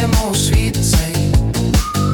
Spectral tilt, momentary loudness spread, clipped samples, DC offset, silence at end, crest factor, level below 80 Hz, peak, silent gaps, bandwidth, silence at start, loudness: -5 dB/octave; 1 LU; under 0.1%; under 0.1%; 0 s; 14 dB; -20 dBFS; 0 dBFS; none; 19 kHz; 0 s; -15 LUFS